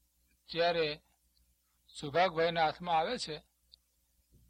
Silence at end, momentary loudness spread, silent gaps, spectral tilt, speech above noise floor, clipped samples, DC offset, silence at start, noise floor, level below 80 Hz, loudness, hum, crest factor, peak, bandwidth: 1.1 s; 16 LU; none; -4 dB/octave; 42 dB; under 0.1%; under 0.1%; 0.5 s; -75 dBFS; -66 dBFS; -33 LUFS; 60 Hz at -65 dBFS; 20 dB; -16 dBFS; 12.5 kHz